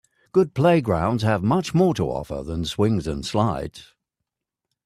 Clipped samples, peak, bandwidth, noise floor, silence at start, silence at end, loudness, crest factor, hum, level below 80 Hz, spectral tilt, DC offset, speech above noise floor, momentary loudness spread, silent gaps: under 0.1%; -6 dBFS; 14 kHz; -84 dBFS; 0.35 s; 1.05 s; -22 LUFS; 18 dB; none; -44 dBFS; -7 dB/octave; under 0.1%; 63 dB; 10 LU; none